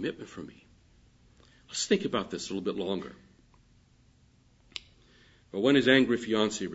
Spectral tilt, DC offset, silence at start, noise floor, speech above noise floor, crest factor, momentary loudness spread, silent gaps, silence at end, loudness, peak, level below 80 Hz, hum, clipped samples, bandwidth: -4 dB/octave; under 0.1%; 0 s; -63 dBFS; 34 dB; 24 dB; 21 LU; none; 0 s; -28 LUFS; -8 dBFS; -64 dBFS; none; under 0.1%; 8 kHz